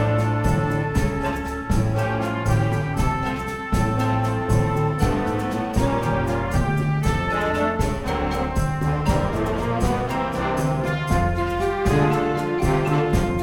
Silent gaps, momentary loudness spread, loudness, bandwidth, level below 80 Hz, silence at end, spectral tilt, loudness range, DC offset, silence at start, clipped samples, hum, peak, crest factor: none; 4 LU; -22 LUFS; 18 kHz; -30 dBFS; 0 s; -7 dB/octave; 1 LU; under 0.1%; 0 s; under 0.1%; none; -8 dBFS; 14 dB